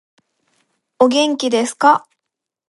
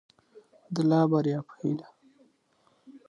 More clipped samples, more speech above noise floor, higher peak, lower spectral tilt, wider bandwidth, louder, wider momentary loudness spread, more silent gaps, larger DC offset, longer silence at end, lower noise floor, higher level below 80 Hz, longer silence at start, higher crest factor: neither; first, 66 dB vs 42 dB; first, 0 dBFS vs -12 dBFS; second, -2.5 dB/octave vs -8.5 dB/octave; about the same, 11.5 kHz vs 10.5 kHz; first, -15 LUFS vs -27 LUFS; second, 4 LU vs 12 LU; neither; neither; first, 0.7 s vs 0.1 s; first, -81 dBFS vs -68 dBFS; about the same, -72 dBFS vs -76 dBFS; first, 1 s vs 0.7 s; about the same, 18 dB vs 18 dB